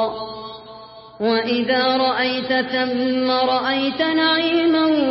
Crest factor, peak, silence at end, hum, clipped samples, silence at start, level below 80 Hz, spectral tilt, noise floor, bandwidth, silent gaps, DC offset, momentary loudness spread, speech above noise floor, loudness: 14 dB; -6 dBFS; 0 s; none; under 0.1%; 0 s; -58 dBFS; -8.5 dB/octave; -40 dBFS; 5.8 kHz; none; under 0.1%; 15 LU; 21 dB; -18 LUFS